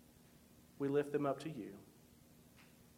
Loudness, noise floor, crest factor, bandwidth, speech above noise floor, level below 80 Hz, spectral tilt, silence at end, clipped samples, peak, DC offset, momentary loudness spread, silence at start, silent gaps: -40 LUFS; -65 dBFS; 20 dB; 16.5 kHz; 25 dB; -76 dBFS; -7 dB/octave; 0.35 s; under 0.1%; -24 dBFS; under 0.1%; 26 LU; 0.55 s; none